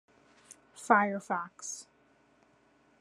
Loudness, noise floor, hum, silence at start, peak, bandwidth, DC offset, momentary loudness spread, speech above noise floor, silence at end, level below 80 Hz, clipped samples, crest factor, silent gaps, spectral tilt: -30 LUFS; -67 dBFS; none; 0.75 s; -10 dBFS; 13 kHz; under 0.1%; 21 LU; 36 dB; 1.2 s; -84 dBFS; under 0.1%; 26 dB; none; -4 dB/octave